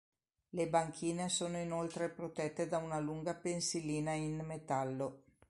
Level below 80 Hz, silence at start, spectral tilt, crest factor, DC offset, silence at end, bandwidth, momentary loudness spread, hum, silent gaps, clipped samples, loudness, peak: -70 dBFS; 0.55 s; -4.5 dB/octave; 20 dB; under 0.1%; 0.3 s; 11.5 kHz; 6 LU; none; none; under 0.1%; -39 LUFS; -18 dBFS